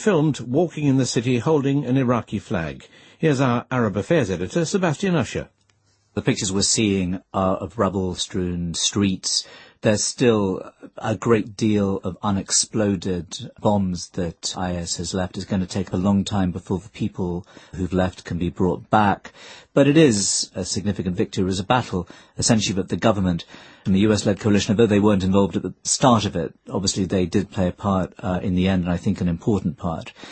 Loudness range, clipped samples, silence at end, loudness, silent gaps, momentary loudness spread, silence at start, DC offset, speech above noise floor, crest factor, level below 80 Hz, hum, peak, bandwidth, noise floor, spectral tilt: 5 LU; under 0.1%; 0 s; -22 LUFS; none; 10 LU; 0 s; under 0.1%; 42 dB; 20 dB; -48 dBFS; none; 0 dBFS; 8.8 kHz; -63 dBFS; -5 dB/octave